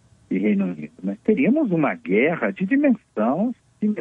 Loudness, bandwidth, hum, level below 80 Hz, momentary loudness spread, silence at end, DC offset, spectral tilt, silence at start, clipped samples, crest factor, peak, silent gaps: -22 LUFS; 3.7 kHz; none; -66 dBFS; 8 LU; 0 s; under 0.1%; -9.5 dB/octave; 0.3 s; under 0.1%; 14 dB; -6 dBFS; none